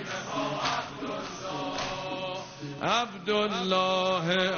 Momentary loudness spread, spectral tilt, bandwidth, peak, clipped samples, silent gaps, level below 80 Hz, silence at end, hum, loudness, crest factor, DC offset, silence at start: 10 LU; -2.5 dB/octave; 7 kHz; -12 dBFS; under 0.1%; none; -60 dBFS; 0 s; none; -29 LUFS; 18 dB; under 0.1%; 0 s